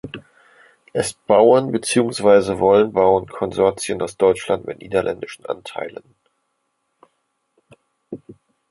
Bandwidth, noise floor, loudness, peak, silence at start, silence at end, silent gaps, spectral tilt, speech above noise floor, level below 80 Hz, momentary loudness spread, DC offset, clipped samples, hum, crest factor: 11.5 kHz; -72 dBFS; -18 LUFS; 0 dBFS; 0.05 s; 0.4 s; none; -5 dB/octave; 54 dB; -54 dBFS; 19 LU; under 0.1%; under 0.1%; none; 20 dB